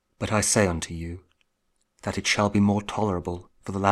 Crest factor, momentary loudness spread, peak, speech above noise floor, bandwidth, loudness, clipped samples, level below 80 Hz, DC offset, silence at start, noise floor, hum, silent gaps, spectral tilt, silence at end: 22 dB; 15 LU; -4 dBFS; 48 dB; 15 kHz; -25 LUFS; under 0.1%; -48 dBFS; under 0.1%; 0.2 s; -73 dBFS; none; none; -4.5 dB/octave; 0 s